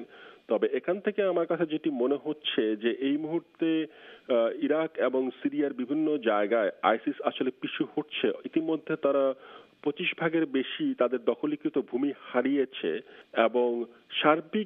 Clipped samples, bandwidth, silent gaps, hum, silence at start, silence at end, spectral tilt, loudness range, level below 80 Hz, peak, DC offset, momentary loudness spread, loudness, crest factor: under 0.1%; 3.9 kHz; none; none; 0 s; 0 s; -8.5 dB/octave; 1 LU; -82 dBFS; -8 dBFS; under 0.1%; 6 LU; -29 LUFS; 20 dB